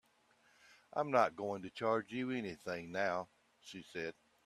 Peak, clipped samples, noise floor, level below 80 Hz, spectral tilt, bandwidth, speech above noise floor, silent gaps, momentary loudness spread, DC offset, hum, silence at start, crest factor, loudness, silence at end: -16 dBFS; under 0.1%; -72 dBFS; -80 dBFS; -5.5 dB/octave; 13.5 kHz; 34 dB; none; 17 LU; under 0.1%; none; 0.95 s; 24 dB; -39 LUFS; 0.35 s